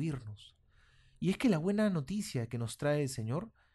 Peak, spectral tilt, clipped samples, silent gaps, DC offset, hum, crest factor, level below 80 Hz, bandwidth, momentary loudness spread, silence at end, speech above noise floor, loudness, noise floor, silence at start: -18 dBFS; -6.5 dB/octave; under 0.1%; none; under 0.1%; none; 16 dB; -62 dBFS; 12 kHz; 10 LU; 0.25 s; 32 dB; -34 LUFS; -66 dBFS; 0 s